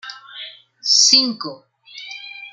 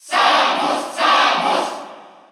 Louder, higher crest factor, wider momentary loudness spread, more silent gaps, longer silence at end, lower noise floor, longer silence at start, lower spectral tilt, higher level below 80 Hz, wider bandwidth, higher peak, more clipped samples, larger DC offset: first, -13 LUFS vs -16 LUFS; first, 20 dB vs 14 dB; first, 24 LU vs 9 LU; neither; second, 0.05 s vs 0.25 s; about the same, -38 dBFS vs -38 dBFS; about the same, 0.05 s vs 0.05 s; second, 0.5 dB/octave vs -1.5 dB/octave; first, -74 dBFS vs -84 dBFS; second, 12 kHz vs 15.5 kHz; about the same, -2 dBFS vs -2 dBFS; neither; neither